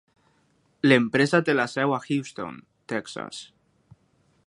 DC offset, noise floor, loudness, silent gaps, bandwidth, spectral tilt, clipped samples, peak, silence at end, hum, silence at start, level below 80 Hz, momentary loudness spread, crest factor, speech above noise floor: under 0.1%; -66 dBFS; -24 LUFS; none; 11.5 kHz; -5.5 dB/octave; under 0.1%; -2 dBFS; 1 s; none; 0.85 s; -68 dBFS; 18 LU; 24 dB; 42 dB